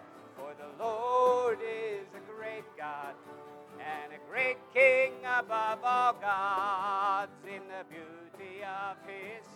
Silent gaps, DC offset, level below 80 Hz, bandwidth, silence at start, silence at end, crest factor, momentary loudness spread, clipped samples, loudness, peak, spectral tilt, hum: none; under 0.1%; -90 dBFS; 15 kHz; 0 s; 0 s; 20 dB; 20 LU; under 0.1%; -31 LUFS; -12 dBFS; -3.5 dB/octave; none